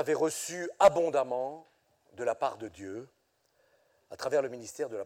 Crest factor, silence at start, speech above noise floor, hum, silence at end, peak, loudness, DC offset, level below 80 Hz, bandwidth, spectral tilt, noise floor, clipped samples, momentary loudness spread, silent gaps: 22 dB; 0 s; 41 dB; none; 0 s; -10 dBFS; -30 LUFS; under 0.1%; -70 dBFS; 16.5 kHz; -3.5 dB/octave; -72 dBFS; under 0.1%; 19 LU; none